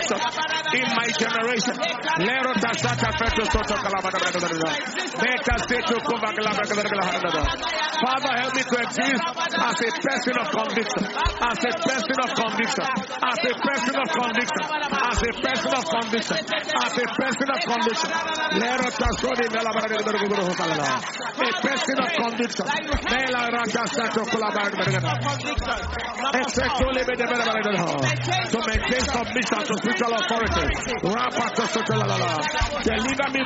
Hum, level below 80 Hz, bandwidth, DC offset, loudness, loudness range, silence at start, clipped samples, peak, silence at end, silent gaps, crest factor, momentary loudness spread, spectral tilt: none; -40 dBFS; 8 kHz; under 0.1%; -23 LUFS; 1 LU; 0 s; under 0.1%; -6 dBFS; 0 s; none; 18 dB; 3 LU; -2.5 dB/octave